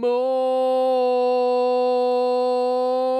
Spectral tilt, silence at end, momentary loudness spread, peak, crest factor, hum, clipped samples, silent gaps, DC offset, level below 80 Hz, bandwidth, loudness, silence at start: -4 dB/octave; 0 s; 1 LU; -12 dBFS; 8 dB; none; under 0.1%; none; under 0.1%; under -90 dBFS; 9 kHz; -20 LUFS; 0 s